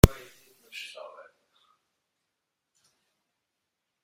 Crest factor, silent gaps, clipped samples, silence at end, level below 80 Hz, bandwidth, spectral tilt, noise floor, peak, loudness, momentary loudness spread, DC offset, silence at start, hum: 30 dB; none; under 0.1%; 3.95 s; -36 dBFS; 16 kHz; -6 dB/octave; -84 dBFS; 0 dBFS; -30 LUFS; 21 LU; under 0.1%; 0.05 s; none